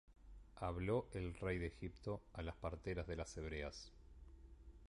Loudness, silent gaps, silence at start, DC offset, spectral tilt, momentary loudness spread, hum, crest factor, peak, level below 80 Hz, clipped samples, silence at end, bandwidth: -47 LUFS; none; 0.1 s; under 0.1%; -6.5 dB/octave; 21 LU; none; 20 dB; -28 dBFS; -56 dBFS; under 0.1%; 0 s; 11 kHz